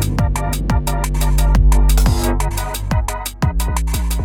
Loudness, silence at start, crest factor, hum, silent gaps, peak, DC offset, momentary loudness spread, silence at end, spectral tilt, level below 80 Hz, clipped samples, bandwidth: -18 LUFS; 0 s; 14 dB; none; none; -2 dBFS; under 0.1%; 6 LU; 0 s; -5 dB/octave; -16 dBFS; under 0.1%; 17 kHz